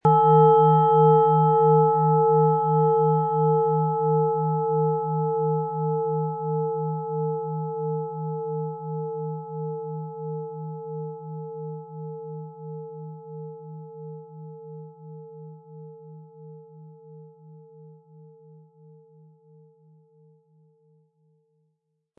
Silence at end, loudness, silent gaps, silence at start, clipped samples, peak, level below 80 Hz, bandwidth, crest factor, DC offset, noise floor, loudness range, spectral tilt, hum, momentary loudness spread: 4.25 s; -22 LUFS; none; 0.05 s; under 0.1%; -6 dBFS; -72 dBFS; 3.4 kHz; 18 dB; under 0.1%; -76 dBFS; 24 LU; -12.5 dB/octave; none; 24 LU